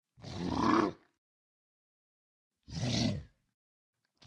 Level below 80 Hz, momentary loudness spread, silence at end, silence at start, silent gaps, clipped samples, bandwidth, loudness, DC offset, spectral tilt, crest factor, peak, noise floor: -58 dBFS; 15 LU; 1 s; 0.2 s; 1.18-2.50 s; under 0.1%; 10.5 kHz; -33 LUFS; under 0.1%; -5.5 dB/octave; 22 dB; -14 dBFS; under -90 dBFS